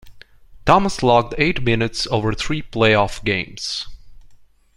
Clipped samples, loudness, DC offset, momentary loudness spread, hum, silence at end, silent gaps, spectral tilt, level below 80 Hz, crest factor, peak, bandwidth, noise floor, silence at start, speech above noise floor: under 0.1%; -19 LUFS; under 0.1%; 10 LU; none; 0.4 s; none; -5 dB/octave; -36 dBFS; 20 dB; 0 dBFS; 15.5 kHz; -47 dBFS; 0.05 s; 29 dB